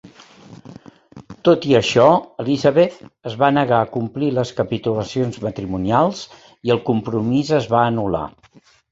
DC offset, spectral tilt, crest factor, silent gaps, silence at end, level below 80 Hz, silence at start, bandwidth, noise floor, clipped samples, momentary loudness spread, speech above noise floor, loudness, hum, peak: under 0.1%; -6.5 dB/octave; 18 dB; none; 0.65 s; -50 dBFS; 0.05 s; 8 kHz; -52 dBFS; under 0.1%; 11 LU; 34 dB; -18 LUFS; none; 0 dBFS